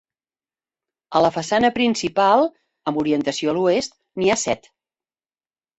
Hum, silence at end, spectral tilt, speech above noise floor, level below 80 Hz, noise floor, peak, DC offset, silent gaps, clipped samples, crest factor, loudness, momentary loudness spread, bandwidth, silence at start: none; 1.2 s; -4 dB/octave; over 71 dB; -58 dBFS; under -90 dBFS; -4 dBFS; under 0.1%; none; under 0.1%; 18 dB; -20 LUFS; 9 LU; 8.4 kHz; 1.1 s